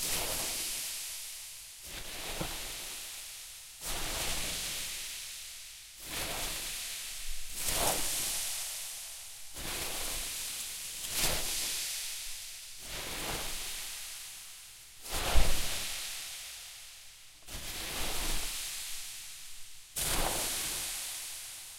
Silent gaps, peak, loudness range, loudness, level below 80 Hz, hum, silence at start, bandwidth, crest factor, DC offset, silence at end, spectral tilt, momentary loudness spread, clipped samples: none; -10 dBFS; 4 LU; -35 LUFS; -42 dBFS; none; 0 s; 16 kHz; 26 dB; under 0.1%; 0 s; -1 dB/octave; 13 LU; under 0.1%